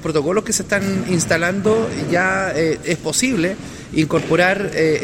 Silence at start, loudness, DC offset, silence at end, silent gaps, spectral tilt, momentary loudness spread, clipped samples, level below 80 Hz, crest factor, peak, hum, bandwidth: 0 s; -18 LUFS; under 0.1%; 0 s; none; -4.5 dB/octave; 5 LU; under 0.1%; -46 dBFS; 16 dB; -2 dBFS; none; 16.5 kHz